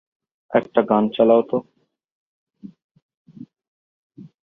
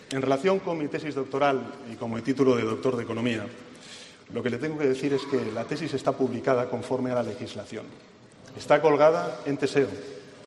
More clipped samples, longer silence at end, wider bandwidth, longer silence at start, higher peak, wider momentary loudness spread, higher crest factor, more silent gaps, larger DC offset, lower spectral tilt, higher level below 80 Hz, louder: neither; first, 0.2 s vs 0 s; second, 4 kHz vs 11.5 kHz; first, 0.5 s vs 0 s; first, -2 dBFS vs -6 dBFS; second, 9 LU vs 18 LU; about the same, 20 dB vs 20 dB; first, 2.04-2.47 s, 2.84-2.95 s, 3.02-3.25 s, 3.68-4.10 s vs none; neither; first, -9.5 dB/octave vs -6 dB/octave; about the same, -68 dBFS vs -68 dBFS; first, -19 LUFS vs -26 LUFS